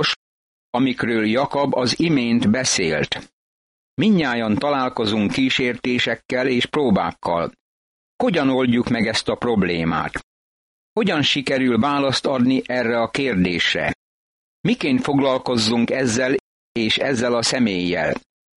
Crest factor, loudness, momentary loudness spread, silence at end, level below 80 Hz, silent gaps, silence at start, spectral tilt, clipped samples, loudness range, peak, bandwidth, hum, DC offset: 14 dB; -20 LUFS; 6 LU; 0.35 s; -50 dBFS; 0.16-0.73 s, 3.33-3.97 s, 6.25-6.29 s, 7.60-8.19 s, 10.23-10.96 s, 13.95-14.64 s, 16.40-16.75 s; 0 s; -4.5 dB/octave; under 0.1%; 2 LU; -6 dBFS; 11.5 kHz; none; under 0.1%